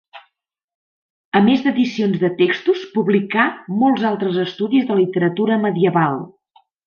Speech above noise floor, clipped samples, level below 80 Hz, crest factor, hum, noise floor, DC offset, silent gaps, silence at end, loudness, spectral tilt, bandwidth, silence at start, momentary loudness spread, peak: 54 dB; under 0.1%; -64 dBFS; 16 dB; none; -71 dBFS; under 0.1%; 0.64-0.68 s, 0.75-1.32 s; 0.6 s; -18 LUFS; -7.5 dB/octave; 6.8 kHz; 0.15 s; 5 LU; -2 dBFS